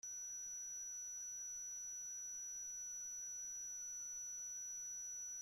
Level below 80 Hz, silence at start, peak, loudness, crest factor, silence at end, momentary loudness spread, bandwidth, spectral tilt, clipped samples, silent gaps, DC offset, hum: -82 dBFS; 0.05 s; -44 dBFS; -46 LUFS; 6 dB; 0 s; 0 LU; 16 kHz; 2 dB/octave; under 0.1%; none; under 0.1%; none